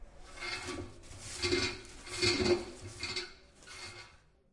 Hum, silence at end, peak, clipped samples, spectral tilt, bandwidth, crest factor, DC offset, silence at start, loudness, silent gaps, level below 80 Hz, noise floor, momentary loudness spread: none; 0.35 s; -16 dBFS; under 0.1%; -3.5 dB/octave; 11.5 kHz; 22 dB; under 0.1%; 0 s; -35 LUFS; none; -54 dBFS; -60 dBFS; 20 LU